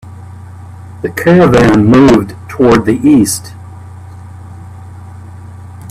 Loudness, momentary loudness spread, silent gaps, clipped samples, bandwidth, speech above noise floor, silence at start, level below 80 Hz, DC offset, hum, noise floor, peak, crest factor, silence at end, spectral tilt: -8 LUFS; 25 LU; none; under 0.1%; 15 kHz; 22 dB; 0.05 s; -34 dBFS; under 0.1%; none; -29 dBFS; 0 dBFS; 12 dB; 0.05 s; -6.5 dB/octave